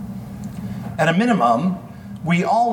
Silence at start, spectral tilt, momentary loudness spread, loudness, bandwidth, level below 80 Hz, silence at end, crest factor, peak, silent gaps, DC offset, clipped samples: 0 s; -6.5 dB/octave; 15 LU; -19 LUFS; 16.5 kHz; -50 dBFS; 0 s; 16 dB; -4 dBFS; none; under 0.1%; under 0.1%